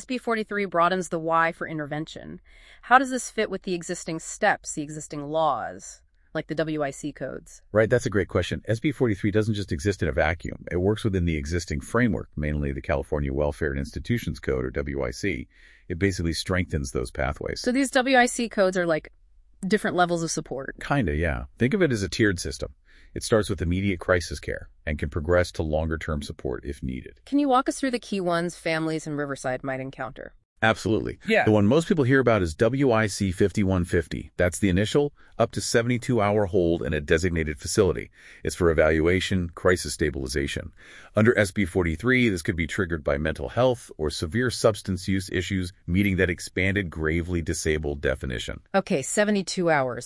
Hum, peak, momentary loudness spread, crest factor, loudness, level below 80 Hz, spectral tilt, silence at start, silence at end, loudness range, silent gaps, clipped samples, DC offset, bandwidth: none; -2 dBFS; 12 LU; 22 dB; -25 LUFS; -42 dBFS; -5.5 dB/octave; 0 s; 0 s; 5 LU; 30.45-30.56 s; under 0.1%; under 0.1%; 12 kHz